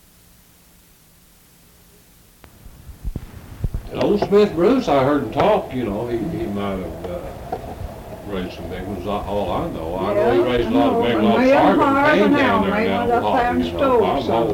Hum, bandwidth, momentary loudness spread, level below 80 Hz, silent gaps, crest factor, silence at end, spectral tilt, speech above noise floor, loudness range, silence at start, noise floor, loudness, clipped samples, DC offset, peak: none; 18 kHz; 16 LU; -38 dBFS; none; 14 dB; 0 s; -7 dB/octave; 33 dB; 11 LU; 2.65 s; -51 dBFS; -18 LUFS; under 0.1%; under 0.1%; -6 dBFS